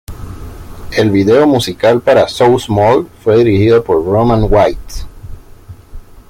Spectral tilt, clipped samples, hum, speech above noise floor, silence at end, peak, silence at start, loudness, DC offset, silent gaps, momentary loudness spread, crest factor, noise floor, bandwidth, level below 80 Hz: -6.5 dB/octave; under 0.1%; none; 25 dB; 0.1 s; 0 dBFS; 0.1 s; -11 LUFS; under 0.1%; none; 20 LU; 12 dB; -34 dBFS; 16.5 kHz; -28 dBFS